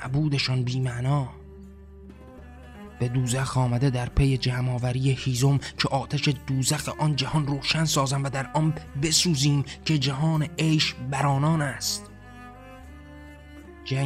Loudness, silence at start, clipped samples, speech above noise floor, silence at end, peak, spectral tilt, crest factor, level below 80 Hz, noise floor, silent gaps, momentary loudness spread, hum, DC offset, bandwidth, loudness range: -25 LUFS; 0 s; under 0.1%; 21 dB; 0 s; -8 dBFS; -4.5 dB/octave; 18 dB; -44 dBFS; -45 dBFS; none; 23 LU; none; under 0.1%; 14 kHz; 5 LU